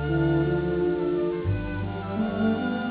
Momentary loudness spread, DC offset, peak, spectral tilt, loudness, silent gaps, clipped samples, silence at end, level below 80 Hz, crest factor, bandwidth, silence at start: 7 LU; under 0.1%; -14 dBFS; -12 dB/octave; -26 LUFS; none; under 0.1%; 0 s; -40 dBFS; 12 dB; 4 kHz; 0 s